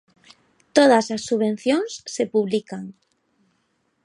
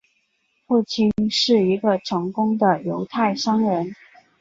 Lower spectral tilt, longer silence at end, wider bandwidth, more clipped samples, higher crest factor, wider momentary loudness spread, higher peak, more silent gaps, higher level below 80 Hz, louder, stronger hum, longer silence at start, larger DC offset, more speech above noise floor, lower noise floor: about the same, -4.5 dB/octave vs -5.5 dB/octave; first, 1.15 s vs 0.45 s; first, 11.5 kHz vs 7.8 kHz; neither; about the same, 22 dB vs 18 dB; first, 17 LU vs 7 LU; about the same, -2 dBFS vs -4 dBFS; neither; second, -68 dBFS vs -58 dBFS; about the same, -21 LUFS vs -20 LUFS; neither; about the same, 0.75 s vs 0.7 s; neither; about the same, 49 dB vs 48 dB; about the same, -69 dBFS vs -68 dBFS